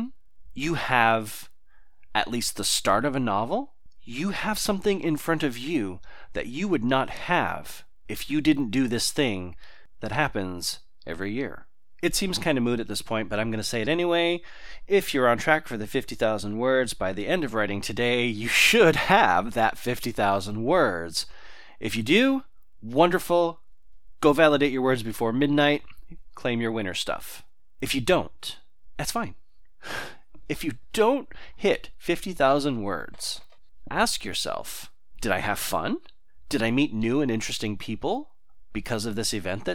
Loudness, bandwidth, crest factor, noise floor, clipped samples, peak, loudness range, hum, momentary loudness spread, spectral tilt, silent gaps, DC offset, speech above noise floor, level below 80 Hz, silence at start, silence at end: -25 LUFS; 17.5 kHz; 22 dB; -56 dBFS; under 0.1%; -4 dBFS; 7 LU; none; 15 LU; -4 dB/octave; none; 1%; 31 dB; -48 dBFS; 0 s; 0 s